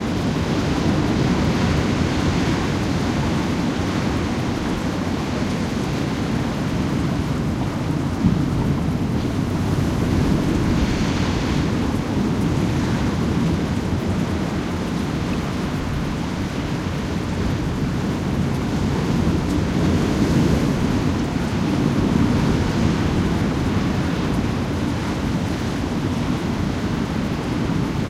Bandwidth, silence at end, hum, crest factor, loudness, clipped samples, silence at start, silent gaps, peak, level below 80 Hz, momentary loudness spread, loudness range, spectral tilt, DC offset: 15.5 kHz; 0 s; none; 16 dB; -21 LUFS; under 0.1%; 0 s; none; -4 dBFS; -32 dBFS; 4 LU; 3 LU; -6.5 dB/octave; under 0.1%